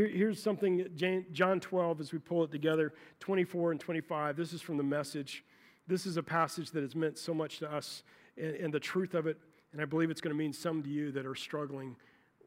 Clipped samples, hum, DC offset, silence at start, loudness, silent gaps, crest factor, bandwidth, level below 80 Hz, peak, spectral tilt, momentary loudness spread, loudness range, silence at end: under 0.1%; none; under 0.1%; 0 s; -35 LUFS; none; 22 dB; 16 kHz; -84 dBFS; -14 dBFS; -6 dB/octave; 10 LU; 4 LU; 0.5 s